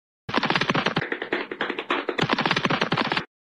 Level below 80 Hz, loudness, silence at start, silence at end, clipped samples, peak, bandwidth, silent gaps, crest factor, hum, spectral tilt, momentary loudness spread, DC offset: -58 dBFS; -24 LUFS; 0.3 s; 0.25 s; under 0.1%; -6 dBFS; 11.5 kHz; none; 20 dB; none; -5 dB/octave; 6 LU; under 0.1%